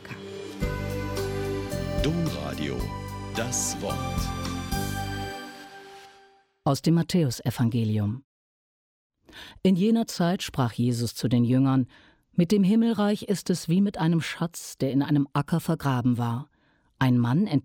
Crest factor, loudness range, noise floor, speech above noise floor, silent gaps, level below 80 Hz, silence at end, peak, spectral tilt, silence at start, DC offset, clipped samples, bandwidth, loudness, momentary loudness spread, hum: 16 dB; 6 LU; -58 dBFS; 34 dB; 8.24-9.10 s; -44 dBFS; 0.05 s; -10 dBFS; -6 dB/octave; 0 s; under 0.1%; under 0.1%; 17.5 kHz; -26 LUFS; 12 LU; none